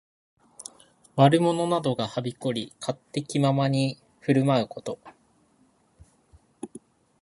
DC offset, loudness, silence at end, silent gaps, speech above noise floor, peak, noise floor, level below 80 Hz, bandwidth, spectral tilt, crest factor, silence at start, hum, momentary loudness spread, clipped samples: under 0.1%; -25 LUFS; 0.45 s; none; 40 dB; -2 dBFS; -64 dBFS; -66 dBFS; 11.5 kHz; -6.5 dB/octave; 24 dB; 0.6 s; none; 22 LU; under 0.1%